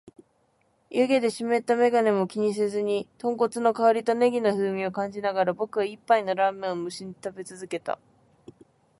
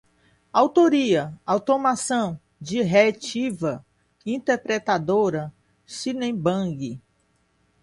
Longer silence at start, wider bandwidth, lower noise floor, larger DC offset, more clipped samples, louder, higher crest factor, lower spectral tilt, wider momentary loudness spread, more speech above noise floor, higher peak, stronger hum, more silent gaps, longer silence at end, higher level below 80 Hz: first, 0.9 s vs 0.55 s; about the same, 11.5 kHz vs 11.5 kHz; about the same, -68 dBFS vs -66 dBFS; neither; neither; about the same, -25 LUFS vs -23 LUFS; about the same, 18 dB vs 20 dB; about the same, -5.5 dB/octave vs -5 dB/octave; about the same, 13 LU vs 15 LU; about the same, 43 dB vs 44 dB; second, -8 dBFS vs -4 dBFS; neither; neither; first, 1.05 s vs 0.85 s; second, -72 dBFS vs -62 dBFS